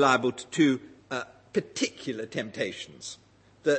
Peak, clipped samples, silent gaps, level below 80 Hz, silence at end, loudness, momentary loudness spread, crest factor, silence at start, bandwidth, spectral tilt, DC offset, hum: -8 dBFS; under 0.1%; none; -72 dBFS; 0 s; -30 LUFS; 15 LU; 22 dB; 0 s; 8.8 kHz; -4 dB/octave; under 0.1%; none